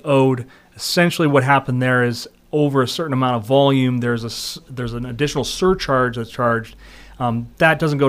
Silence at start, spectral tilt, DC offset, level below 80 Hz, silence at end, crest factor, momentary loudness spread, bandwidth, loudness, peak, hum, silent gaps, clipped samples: 0.05 s; -5.5 dB/octave; under 0.1%; -44 dBFS; 0 s; 18 dB; 11 LU; 15.5 kHz; -18 LUFS; 0 dBFS; none; none; under 0.1%